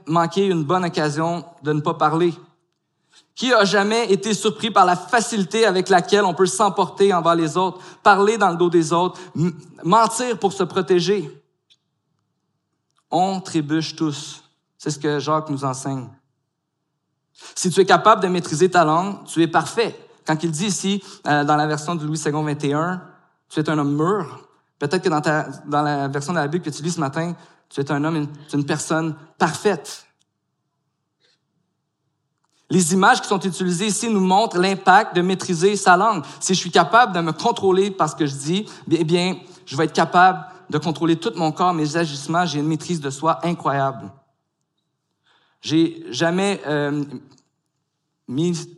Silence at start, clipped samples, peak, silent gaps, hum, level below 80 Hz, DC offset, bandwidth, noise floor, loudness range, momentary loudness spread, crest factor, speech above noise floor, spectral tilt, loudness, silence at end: 0.05 s; under 0.1%; 0 dBFS; none; none; -72 dBFS; under 0.1%; 12.5 kHz; -76 dBFS; 8 LU; 11 LU; 20 dB; 56 dB; -4.5 dB/octave; -19 LUFS; 0.05 s